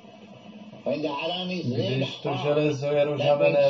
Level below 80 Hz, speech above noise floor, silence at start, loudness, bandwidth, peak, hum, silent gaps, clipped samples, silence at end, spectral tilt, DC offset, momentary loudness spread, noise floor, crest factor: -70 dBFS; 22 dB; 0.05 s; -26 LUFS; 7.2 kHz; -10 dBFS; none; none; under 0.1%; 0 s; -4.5 dB/octave; under 0.1%; 13 LU; -46 dBFS; 16 dB